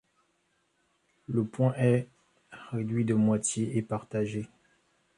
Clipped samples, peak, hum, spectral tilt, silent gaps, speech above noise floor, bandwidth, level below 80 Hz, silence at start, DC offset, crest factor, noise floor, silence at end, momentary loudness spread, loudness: under 0.1%; -12 dBFS; none; -6.5 dB/octave; none; 46 dB; 11 kHz; -66 dBFS; 1.3 s; under 0.1%; 18 dB; -73 dBFS; 0.7 s; 18 LU; -29 LUFS